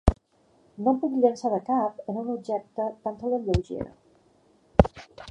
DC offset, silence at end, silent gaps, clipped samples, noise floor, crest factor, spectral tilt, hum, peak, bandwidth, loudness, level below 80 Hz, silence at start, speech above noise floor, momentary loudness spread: under 0.1%; 0 s; none; under 0.1%; -63 dBFS; 26 dB; -8.5 dB/octave; none; 0 dBFS; 10.5 kHz; -27 LUFS; -36 dBFS; 0.05 s; 36 dB; 12 LU